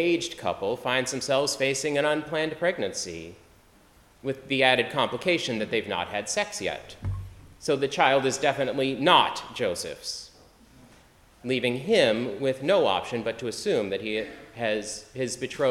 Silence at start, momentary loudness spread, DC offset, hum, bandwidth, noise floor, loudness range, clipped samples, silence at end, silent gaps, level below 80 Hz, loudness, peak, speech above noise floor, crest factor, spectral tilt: 0 s; 13 LU; under 0.1%; none; 15.5 kHz; -57 dBFS; 3 LU; under 0.1%; 0 s; none; -56 dBFS; -26 LUFS; -4 dBFS; 31 dB; 22 dB; -3.5 dB/octave